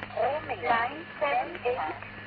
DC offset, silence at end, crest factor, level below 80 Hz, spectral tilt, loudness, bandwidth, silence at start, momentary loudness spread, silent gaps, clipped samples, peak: under 0.1%; 0 s; 18 dB; -60 dBFS; -2 dB/octave; -30 LUFS; 5.2 kHz; 0 s; 6 LU; none; under 0.1%; -12 dBFS